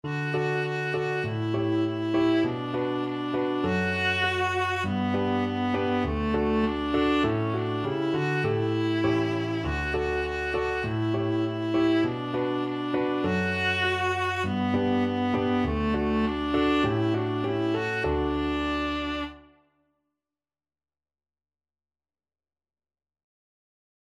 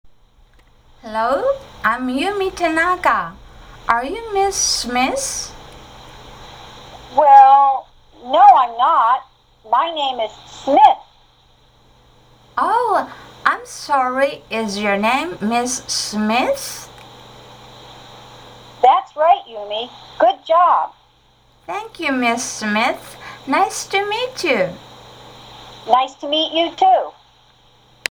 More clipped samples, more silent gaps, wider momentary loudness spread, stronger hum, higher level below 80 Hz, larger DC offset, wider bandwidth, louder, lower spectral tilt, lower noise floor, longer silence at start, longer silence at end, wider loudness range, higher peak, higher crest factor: neither; neither; second, 4 LU vs 17 LU; neither; first, -44 dBFS vs -50 dBFS; neither; second, 11.5 kHz vs over 20 kHz; second, -26 LUFS vs -16 LUFS; first, -7 dB/octave vs -2.5 dB/octave; first, under -90 dBFS vs -54 dBFS; about the same, 0.05 s vs 0.05 s; first, 4.7 s vs 1.05 s; second, 3 LU vs 8 LU; second, -12 dBFS vs 0 dBFS; about the same, 14 dB vs 18 dB